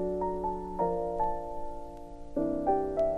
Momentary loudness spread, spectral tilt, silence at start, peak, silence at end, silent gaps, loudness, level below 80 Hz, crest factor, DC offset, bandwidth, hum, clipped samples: 14 LU; -9 dB/octave; 0 s; -14 dBFS; 0 s; none; -32 LUFS; -46 dBFS; 16 dB; under 0.1%; 10 kHz; none; under 0.1%